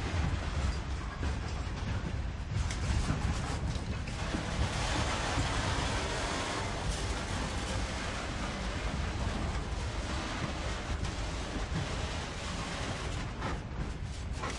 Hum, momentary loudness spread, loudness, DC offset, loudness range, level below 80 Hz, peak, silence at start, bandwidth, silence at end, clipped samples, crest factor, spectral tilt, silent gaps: none; 6 LU; -35 LUFS; under 0.1%; 3 LU; -38 dBFS; -18 dBFS; 0 s; 11.5 kHz; 0 s; under 0.1%; 16 dB; -4.5 dB/octave; none